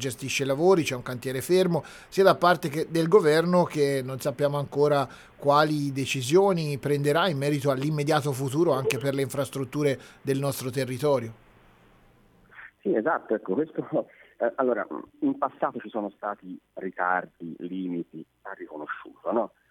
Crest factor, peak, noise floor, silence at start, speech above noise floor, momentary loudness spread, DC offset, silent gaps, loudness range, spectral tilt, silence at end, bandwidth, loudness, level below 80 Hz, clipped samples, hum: 22 dB; -4 dBFS; -58 dBFS; 0 s; 33 dB; 14 LU; under 0.1%; none; 8 LU; -5.5 dB/octave; 0.25 s; 18.5 kHz; -26 LUFS; -64 dBFS; under 0.1%; none